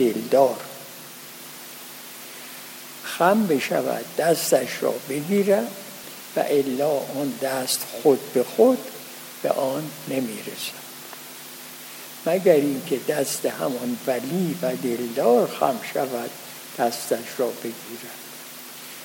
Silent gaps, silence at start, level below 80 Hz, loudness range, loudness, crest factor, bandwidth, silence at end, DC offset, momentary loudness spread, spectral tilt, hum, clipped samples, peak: none; 0 s; -78 dBFS; 5 LU; -23 LUFS; 20 dB; 17 kHz; 0 s; under 0.1%; 17 LU; -4 dB/octave; none; under 0.1%; -4 dBFS